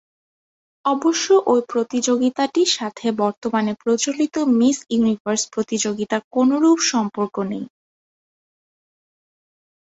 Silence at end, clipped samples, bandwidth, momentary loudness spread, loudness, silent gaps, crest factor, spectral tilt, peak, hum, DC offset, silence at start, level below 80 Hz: 2.15 s; under 0.1%; 8.2 kHz; 8 LU; -19 LUFS; 3.37-3.42 s, 5.20-5.25 s, 6.24-6.31 s; 16 dB; -3.5 dB/octave; -4 dBFS; none; under 0.1%; 0.85 s; -64 dBFS